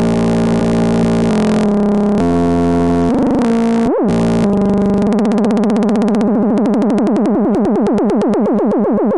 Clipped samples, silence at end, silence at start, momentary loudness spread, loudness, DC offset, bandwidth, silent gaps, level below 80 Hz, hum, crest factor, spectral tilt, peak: under 0.1%; 0 s; 0 s; 0 LU; -13 LUFS; under 0.1%; 11 kHz; none; -36 dBFS; none; 10 dB; -8 dB/octave; -2 dBFS